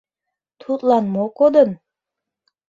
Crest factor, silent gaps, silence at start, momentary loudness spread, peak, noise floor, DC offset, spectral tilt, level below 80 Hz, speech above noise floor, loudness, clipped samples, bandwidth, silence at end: 18 dB; none; 0.7 s; 11 LU; -2 dBFS; -84 dBFS; under 0.1%; -8.5 dB/octave; -64 dBFS; 68 dB; -17 LUFS; under 0.1%; 7.4 kHz; 0.95 s